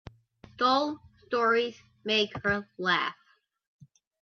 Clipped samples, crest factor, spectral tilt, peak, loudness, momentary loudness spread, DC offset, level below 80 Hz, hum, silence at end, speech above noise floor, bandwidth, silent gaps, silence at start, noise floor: under 0.1%; 20 dB; -4.5 dB/octave; -10 dBFS; -28 LUFS; 10 LU; under 0.1%; -64 dBFS; none; 1.1 s; 28 dB; 7 kHz; none; 0.6 s; -56 dBFS